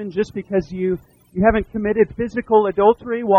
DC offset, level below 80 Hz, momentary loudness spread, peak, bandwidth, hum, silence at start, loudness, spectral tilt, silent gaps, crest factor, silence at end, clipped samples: under 0.1%; -40 dBFS; 8 LU; -2 dBFS; 7.2 kHz; none; 0 s; -19 LUFS; -8.5 dB/octave; none; 18 dB; 0 s; under 0.1%